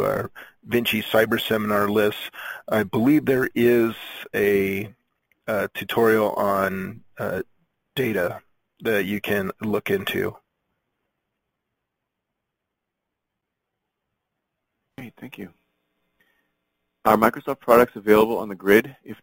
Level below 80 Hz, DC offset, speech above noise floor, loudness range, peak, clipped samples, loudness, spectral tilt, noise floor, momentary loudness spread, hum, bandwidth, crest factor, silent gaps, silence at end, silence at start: -58 dBFS; under 0.1%; 60 dB; 8 LU; -2 dBFS; under 0.1%; -22 LUFS; -5.5 dB/octave; -82 dBFS; 18 LU; none; 17 kHz; 22 dB; none; 0.1 s; 0 s